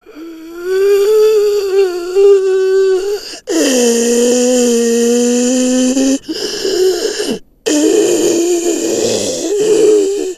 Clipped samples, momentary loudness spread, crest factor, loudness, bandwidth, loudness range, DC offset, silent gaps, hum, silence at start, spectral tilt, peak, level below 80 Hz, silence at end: under 0.1%; 9 LU; 12 dB; -12 LUFS; 14 kHz; 2 LU; under 0.1%; none; none; 0.1 s; -2.5 dB/octave; 0 dBFS; -50 dBFS; 0 s